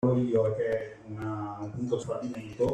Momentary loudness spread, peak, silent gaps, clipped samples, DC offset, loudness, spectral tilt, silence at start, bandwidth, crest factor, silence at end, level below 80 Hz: 12 LU; -14 dBFS; none; under 0.1%; under 0.1%; -31 LUFS; -8 dB/octave; 0 s; 9.6 kHz; 16 dB; 0 s; -60 dBFS